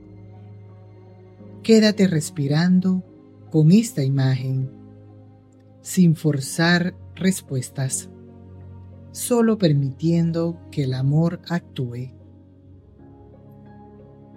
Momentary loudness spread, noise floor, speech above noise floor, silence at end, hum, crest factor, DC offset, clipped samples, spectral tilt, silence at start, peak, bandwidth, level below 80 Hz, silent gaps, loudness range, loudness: 16 LU; -49 dBFS; 30 dB; 2.25 s; none; 18 dB; under 0.1%; under 0.1%; -6 dB/octave; 0.1 s; -4 dBFS; 15.5 kHz; -62 dBFS; none; 6 LU; -21 LUFS